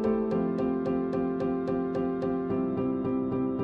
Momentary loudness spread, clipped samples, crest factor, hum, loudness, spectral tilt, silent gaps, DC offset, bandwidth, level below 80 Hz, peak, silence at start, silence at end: 2 LU; under 0.1%; 12 dB; none; -29 LUFS; -10 dB/octave; none; under 0.1%; 5.4 kHz; -54 dBFS; -16 dBFS; 0 s; 0 s